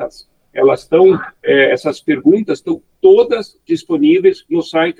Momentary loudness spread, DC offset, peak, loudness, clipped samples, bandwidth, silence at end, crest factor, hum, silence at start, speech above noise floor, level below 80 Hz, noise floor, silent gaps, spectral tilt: 10 LU; under 0.1%; 0 dBFS; -13 LUFS; under 0.1%; 9.6 kHz; 0.1 s; 12 dB; none; 0 s; 19 dB; -58 dBFS; -31 dBFS; none; -6.5 dB/octave